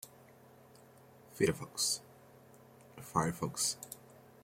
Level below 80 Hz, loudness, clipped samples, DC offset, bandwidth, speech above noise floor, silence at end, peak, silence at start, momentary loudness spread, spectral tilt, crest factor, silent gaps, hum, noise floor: -68 dBFS; -35 LUFS; under 0.1%; under 0.1%; 16.5 kHz; 25 dB; 0.25 s; -16 dBFS; 0.05 s; 20 LU; -3 dB/octave; 24 dB; none; none; -60 dBFS